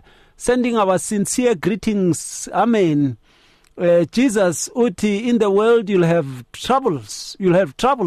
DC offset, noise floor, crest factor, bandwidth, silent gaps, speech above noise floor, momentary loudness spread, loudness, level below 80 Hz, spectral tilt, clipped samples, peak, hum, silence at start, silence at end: under 0.1%; -53 dBFS; 10 dB; 13 kHz; none; 36 dB; 8 LU; -18 LUFS; -48 dBFS; -5.5 dB/octave; under 0.1%; -6 dBFS; none; 0.4 s; 0 s